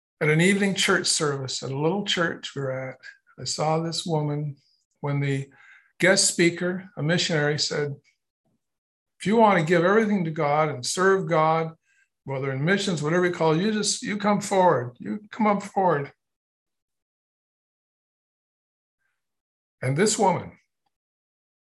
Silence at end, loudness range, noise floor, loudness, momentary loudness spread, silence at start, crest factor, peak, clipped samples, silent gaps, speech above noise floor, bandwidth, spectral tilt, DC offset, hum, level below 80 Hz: 1.2 s; 7 LU; under -90 dBFS; -23 LUFS; 12 LU; 0.2 s; 20 dB; -6 dBFS; under 0.1%; 4.85-4.91 s, 8.30-8.44 s, 8.78-9.06 s, 16.36-16.66 s, 16.82-16.88 s, 17.02-18.98 s, 19.41-19.78 s; over 67 dB; 12.5 kHz; -4 dB/octave; under 0.1%; none; -68 dBFS